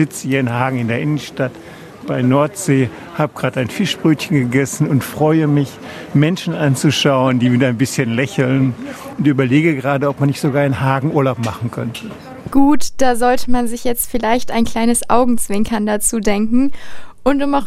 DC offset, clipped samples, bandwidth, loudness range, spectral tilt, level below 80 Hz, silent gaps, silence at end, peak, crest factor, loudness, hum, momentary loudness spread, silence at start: under 0.1%; under 0.1%; 15.5 kHz; 2 LU; -5.5 dB/octave; -38 dBFS; none; 0 s; 0 dBFS; 14 dB; -16 LUFS; none; 9 LU; 0 s